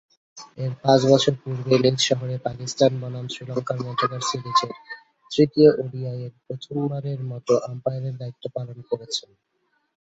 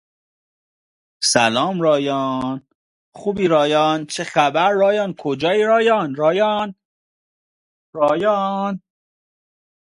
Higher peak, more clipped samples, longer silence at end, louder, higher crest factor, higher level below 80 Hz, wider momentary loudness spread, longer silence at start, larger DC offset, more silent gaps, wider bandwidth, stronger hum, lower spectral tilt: about the same, -2 dBFS vs 0 dBFS; neither; second, 0.9 s vs 1.05 s; second, -23 LUFS vs -18 LUFS; about the same, 22 dB vs 20 dB; about the same, -62 dBFS vs -60 dBFS; first, 16 LU vs 10 LU; second, 0.35 s vs 1.2 s; neither; second, none vs 2.75-3.12 s, 6.85-7.93 s; second, 8.2 kHz vs 11.5 kHz; neither; first, -5.5 dB/octave vs -4 dB/octave